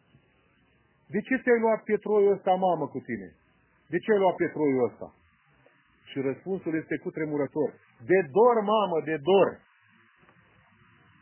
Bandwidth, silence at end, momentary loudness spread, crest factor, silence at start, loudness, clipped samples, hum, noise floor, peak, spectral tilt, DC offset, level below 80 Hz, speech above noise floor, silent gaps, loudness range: 3.2 kHz; 1.65 s; 12 LU; 18 dB; 1.1 s; -26 LUFS; under 0.1%; none; -65 dBFS; -10 dBFS; -10 dB/octave; under 0.1%; -70 dBFS; 40 dB; none; 5 LU